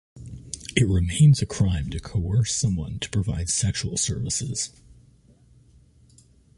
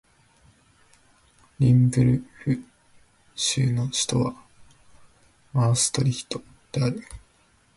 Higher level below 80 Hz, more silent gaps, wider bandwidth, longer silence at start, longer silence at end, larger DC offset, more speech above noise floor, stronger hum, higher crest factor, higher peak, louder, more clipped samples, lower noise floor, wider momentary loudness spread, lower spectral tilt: first, -38 dBFS vs -52 dBFS; neither; about the same, 11.5 kHz vs 11.5 kHz; second, 0.15 s vs 1.6 s; first, 1.9 s vs 0.6 s; neither; second, 33 dB vs 39 dB; neither; about the same, 20 dB vs 18 dB; about the same, -6 dBFS vs -8 dBFS; about the same, -24 LUFS vs -24 LUFS; neither; second, -55 dBFS vs -61 dBFS; about the same, 13 LU vs 15 LU; about the same, -4.5 dB/octave vs -5 dB/octave